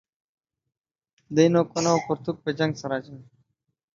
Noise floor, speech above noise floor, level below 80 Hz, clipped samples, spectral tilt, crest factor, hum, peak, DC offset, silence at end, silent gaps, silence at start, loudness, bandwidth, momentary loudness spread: -72 dBFS; 49 dB; -66 dBFS; under 0.1%; -5.5 dB/octave; 22 dB; none; -4 dBFS; under 0.1%; 0.75 s; none; 1.3 s; -24 LUFS; 7.6 kHz; 11 LU